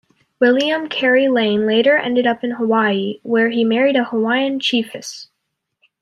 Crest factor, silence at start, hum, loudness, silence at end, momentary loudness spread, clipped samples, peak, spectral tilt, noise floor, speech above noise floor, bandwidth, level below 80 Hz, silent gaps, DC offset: 14 dB; 0.4 s; none; -16 LUFS; 0.8 s; 7 LU; under 0.1%; -4 dBFS; -4.5 dB/octave; -75 dBFS; 59 dB; 11.5 kHz; -66 dBFS; none; under 0.1%